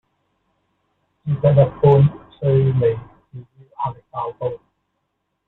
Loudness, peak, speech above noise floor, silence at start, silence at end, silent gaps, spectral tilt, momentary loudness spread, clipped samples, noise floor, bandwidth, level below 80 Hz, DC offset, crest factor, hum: -18 LUFS; -2 dBFS; 58 dB; 1.25 s; 0.9 s; none; -12 dB/octave; 16 LU; under 0.1%; -74 dBFS; 4 kHz; -50 dBFS; under 0.1%; 18 dB; none